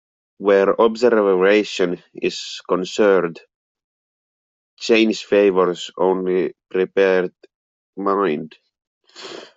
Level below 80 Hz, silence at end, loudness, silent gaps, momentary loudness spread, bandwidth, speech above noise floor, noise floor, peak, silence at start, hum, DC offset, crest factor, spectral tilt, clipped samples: -66 dBFS; 0.1 s; -18 LUFS; 3.55-3.75 s, 3.84-4.77 s, 7.55-7.93 s, 8.87-9.01 s; 13 LU; 7.8 kHz; over 72 dB; under -90 dBFS; -2 dBFS; 0.4 s; none; under 0.1%; 16 dB; -5 dB/octave; under 0.1%